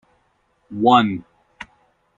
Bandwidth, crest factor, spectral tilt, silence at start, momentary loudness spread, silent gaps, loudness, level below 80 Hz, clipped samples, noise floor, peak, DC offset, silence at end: 7.6 kHz; 20 dB; -6.5 dB/octave; 0.7 s; 25 LU; none; -17 LUFS; -60 dBFS; under 0.1%; -64 dBFS; -2 dBFS; under 0.1%; 0.55 s